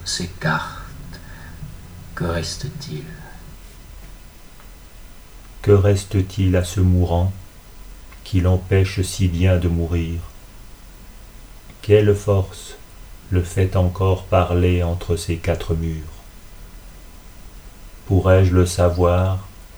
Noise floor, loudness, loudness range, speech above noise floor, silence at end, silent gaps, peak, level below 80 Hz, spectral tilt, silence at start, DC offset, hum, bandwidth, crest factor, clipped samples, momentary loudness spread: -40 dBFS; -19 LUFS; 11 LU; 23 dB; 0.1 s; none; 0 dBFS; -34 dBFS; -6.5 dB/octave; 0 s; under 0.1%; none; over 20 kHz; 20 dB; under 0.1%; 22 LU